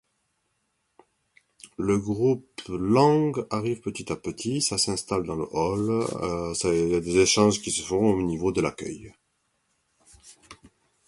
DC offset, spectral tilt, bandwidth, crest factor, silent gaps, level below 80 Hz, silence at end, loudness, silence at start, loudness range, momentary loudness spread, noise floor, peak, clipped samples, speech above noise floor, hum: under 0.1%; -4.5 dB/octave; 11.5 kHz; 22 dB; none; -52 dBFS; 0.55 s; -25 LUFS; 1.65 s; 3 LU; 12 LU; -75 dBFS; -4 dBFS; under 0.1%; 50 dB; none